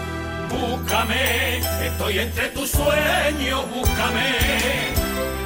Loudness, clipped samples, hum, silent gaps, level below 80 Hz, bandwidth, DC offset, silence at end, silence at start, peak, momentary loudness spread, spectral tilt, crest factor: -21 LUFS; under 0.1%; none; none; -32 dBFS; 16.5 kHz; under 0.1%; 0 s; 0 s; -6 dBFS; 6 LU; -3.5 dB/octave; 14 dB